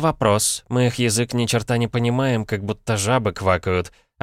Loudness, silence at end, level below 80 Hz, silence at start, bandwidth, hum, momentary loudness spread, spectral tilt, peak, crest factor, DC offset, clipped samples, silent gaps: -20 LUFS; 0.35 s; -46 dBFS; 0 s; 16 kHz; none; 6 LU; -4.5 dB/octave; -4 dBFS; 16 dB; under 0.1%; under 0.1%; none